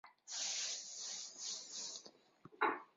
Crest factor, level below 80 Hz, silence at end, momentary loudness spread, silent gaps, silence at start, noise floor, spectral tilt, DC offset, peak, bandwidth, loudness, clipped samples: 24 dB; under -90 dBFS; 0.1 s; 8 LU; none; 0.05 s; -64 dBFS; 1.5 dB/octave; under 0.1%; -22 dBFS; 7.6 kHz; -42 LUFS; under 0.1%